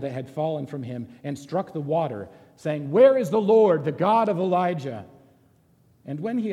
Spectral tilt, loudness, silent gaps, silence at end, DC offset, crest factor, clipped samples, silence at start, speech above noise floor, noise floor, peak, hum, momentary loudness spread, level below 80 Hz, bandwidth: -7.5 dB/octave; -23 LUFS; none; 0 s; under 0.1%; 18 dB; under 0.1%; 0 s; 37 dB; -60 dBFS; -6 dBFS; none; 18 LU; -70 dBFS; 12.5 kHz